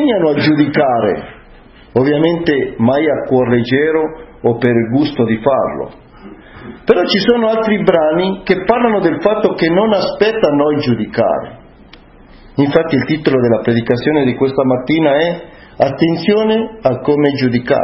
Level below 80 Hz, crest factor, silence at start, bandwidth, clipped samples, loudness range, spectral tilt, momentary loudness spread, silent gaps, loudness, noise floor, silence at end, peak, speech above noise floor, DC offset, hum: -44 dBFS; 14 dB; 0 s; 6 kHz; under 0.1%; 3 LU; -8.5 dB/octave; 6 LU; none; -14 LUFS; -40 dBFS; 0 s; 0 dBFS; 27 dB; under 0.1%; none